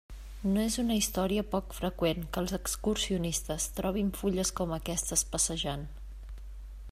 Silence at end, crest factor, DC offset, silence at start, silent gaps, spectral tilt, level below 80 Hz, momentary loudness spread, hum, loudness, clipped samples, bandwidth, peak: 0 s; 20 dB; under 0.1%; 0.1 s; none; -4 dB/octave; -44 dBFS; 18 LU; none; -31 LUFS; under 0.1%; 16 kHz; -12 dBFS